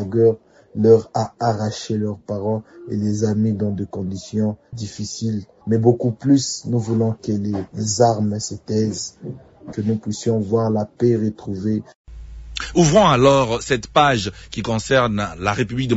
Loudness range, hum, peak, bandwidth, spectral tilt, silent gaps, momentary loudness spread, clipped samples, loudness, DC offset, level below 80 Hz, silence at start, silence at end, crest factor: 6 LU; none; 0 dBFS; 8 kHz; -5.5 dB/octave; 11.95-12.04 s; 13 LU; under 0.1%; -20 LUFS; under 0.1%; -44 dBFS; 0 s; 0 s; 18 dB